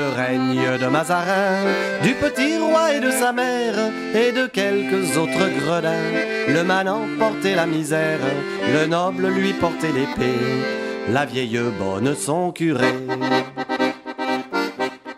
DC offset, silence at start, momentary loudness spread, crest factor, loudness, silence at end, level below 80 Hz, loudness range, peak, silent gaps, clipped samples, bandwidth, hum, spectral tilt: under 0.1%; 0 s; 5 LU; 16 dB; -20 LUFS; 0 s; -56 dBFS; 3 LU; -4 dBFS; none; under 0.1%; 16 kHz; none; -5 dB/octave